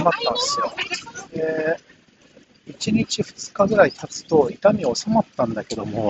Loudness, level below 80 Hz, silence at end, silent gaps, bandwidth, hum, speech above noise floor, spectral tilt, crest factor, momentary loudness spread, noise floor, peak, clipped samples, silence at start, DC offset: -21 LUFS; -54 dBFS; 0 s; none; 8.6 kHz; none; 32 dB; -4.5 dB/octave; 20 dB; 12 LU; -53 dBFS; -2 dBFS; under 0.1%; 0 s; under 0.1%